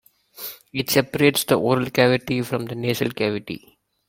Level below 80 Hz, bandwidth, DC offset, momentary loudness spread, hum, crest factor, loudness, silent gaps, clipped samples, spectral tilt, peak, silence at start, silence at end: -58 dBFS; 16.5 kHz; under 0.1%; 16 LU; none; 20 dB; -21 LUFS; none; under 0.1%; -4.5 dB/octave; -2 dBFS; 0.4 s; 0.5 s